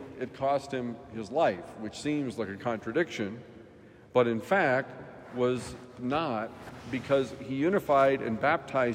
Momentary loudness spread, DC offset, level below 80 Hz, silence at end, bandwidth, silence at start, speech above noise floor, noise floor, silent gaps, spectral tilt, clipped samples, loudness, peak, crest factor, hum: 15 LU; under 0.1%; -64 dBFS; 0 s; 15.5 kHz; 0 s; 24 dB; -53 dBFS; none; -6 dB/octave; under 0.1%; -30 LUFS; -10 dBFS; 20 dB; none